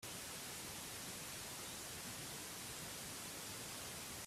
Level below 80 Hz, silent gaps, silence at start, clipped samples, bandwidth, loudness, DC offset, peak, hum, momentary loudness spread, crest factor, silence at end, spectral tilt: -70 dBFS; none; 0 s; under 0.1%; 16 kHz; -47 LUFS; under 0.1%; -36 dBFS; none; 0 LU; 14 dB; 0 s; -1.5 dB/octave